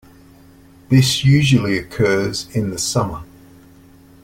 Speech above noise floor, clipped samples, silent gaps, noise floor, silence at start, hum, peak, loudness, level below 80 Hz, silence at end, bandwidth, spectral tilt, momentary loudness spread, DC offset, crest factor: 30 dB; under 0.1%; none; -46 dBFS; 0.9 s; none; -2 dBFS; -17 LUFS; -44 dBFS; 1 s; 16 kHz; -5 dB/octave; 9 LU; under 0.1%; 16 dB